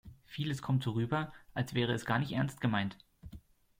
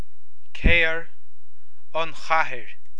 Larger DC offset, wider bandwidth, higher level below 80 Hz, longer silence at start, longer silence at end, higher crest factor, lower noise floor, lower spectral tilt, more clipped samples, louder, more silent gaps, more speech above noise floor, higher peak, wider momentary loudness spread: second, under 0.1% vs 10%; first, 16 kHz vs 8.6 kHz; second, -62 dBFS vs -32 dBFS; second, 0.05 s vs 0.55 s; first, 0.4 s vs 0.25 s; second, 18 dB vs 24 dB; second, -55 dBFS vs -64 dBFS; first, -6.5 dB/octave vs -5 dB/octave; neither; second, -35 LUFS vs -23 LUFS; neither; second, 21 dB vs 43 dB; second, -16 dBFS vs -2 dBFS; first, 20 LU vs 15 LU